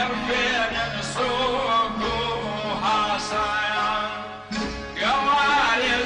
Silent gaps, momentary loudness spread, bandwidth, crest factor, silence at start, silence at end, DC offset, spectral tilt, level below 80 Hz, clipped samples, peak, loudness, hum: none; 10 LU; 11 kHz; 14 dB; 0 s; 0 s; under 0.1%; -3 dB/octave; -44 dBFS; under 0.1%; -10 dBFS; -23 LUFS; none